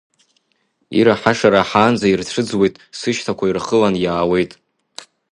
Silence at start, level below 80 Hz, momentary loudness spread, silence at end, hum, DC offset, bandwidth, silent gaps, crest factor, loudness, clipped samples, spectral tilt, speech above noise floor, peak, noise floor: 0.9 s; -50 dBFS; 12 LU; 0.3 s; none; under 0.1%; 11 kHz; none; 18 dB; -16 LUFS; under 0.1%; -5.5 dB/octave; 50 dB; 0 dBFS; -66 dBFS